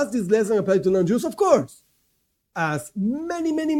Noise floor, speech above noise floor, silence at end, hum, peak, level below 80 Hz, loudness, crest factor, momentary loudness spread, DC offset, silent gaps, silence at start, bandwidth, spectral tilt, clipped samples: -71 dBFS; 49 dB; 0 s; none; -4 dBFS; -60 dBFS; -22 LUFS; 18 dB; 7 LU; under 0.1%; none; 0 s; 16 kHz; -6.5 dB/octave; under 0.1%